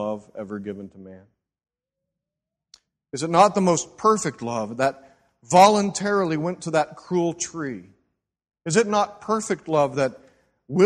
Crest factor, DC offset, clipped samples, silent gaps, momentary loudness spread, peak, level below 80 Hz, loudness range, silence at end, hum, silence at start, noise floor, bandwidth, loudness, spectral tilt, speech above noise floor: 22 dB; under 0.1%; under 0.1%; none; 17 LU; -2 dBFS; -64 dBFS; 5 LU; 0 s; none; 0 s; -86 dBFS; 12.5 kHz; -22 LUFS; -4.5 dB/octave; 64 dB